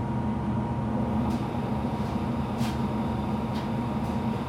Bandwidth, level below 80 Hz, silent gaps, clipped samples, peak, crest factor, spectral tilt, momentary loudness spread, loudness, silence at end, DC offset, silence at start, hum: 15 kHz; -44 dBFS; none; under 0.1%; -16 dBFS; 12 dB; -8 dB/octave; 2 LU; -29 LUFS; 0 s; under 0.1%; 0 s; none